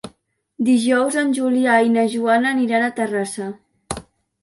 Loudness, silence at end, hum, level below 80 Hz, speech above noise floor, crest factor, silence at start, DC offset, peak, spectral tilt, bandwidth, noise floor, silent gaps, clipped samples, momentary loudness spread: -18 LUFS; 0.4 s; none; -54 dBFS; 43 dB; 16 dB; 0.05 s; under 0.1%; -4 dBFS; -4.5 dB/octave; 11.5 kHz; -61 dBFS; none; under 0.1%; 16 LU